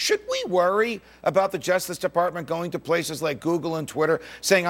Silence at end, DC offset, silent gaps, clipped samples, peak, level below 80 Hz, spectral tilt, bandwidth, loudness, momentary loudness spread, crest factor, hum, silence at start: 0 s; under 0.1%; none; under 0.1%; -4 dBFS; -60 dBFS; -4 dB/octave; 17 kHz; -24 LUFS; 6 LU; 20 dB; none; 0 s